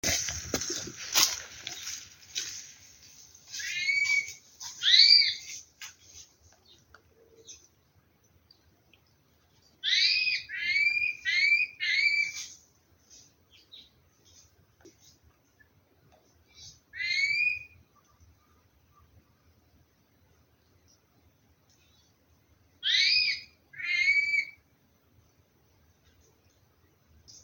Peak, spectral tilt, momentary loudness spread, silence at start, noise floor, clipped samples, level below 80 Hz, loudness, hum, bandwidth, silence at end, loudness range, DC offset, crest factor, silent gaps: -4 dBFS; 1 dB/octave; 21 LU; 0.05 s; -67 dBFS; under 0.1%; -64 dBFS; -25 LUFS; none; 17 kHz; 0.05 s; 11 LU; under 0.1%; 28 dB; none